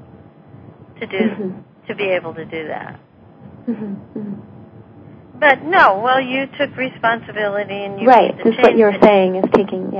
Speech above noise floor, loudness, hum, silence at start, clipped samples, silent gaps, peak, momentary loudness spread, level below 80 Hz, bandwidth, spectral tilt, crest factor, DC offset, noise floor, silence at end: 27 dB; -15 LUFS; none; 0.55 s; 0.2%; none; 0 dBFS; 18 LU; -56 dBFS; 8 kHz; -7 dB/octave; 18 dB; under 0.1%; -42 dBFS; 0 s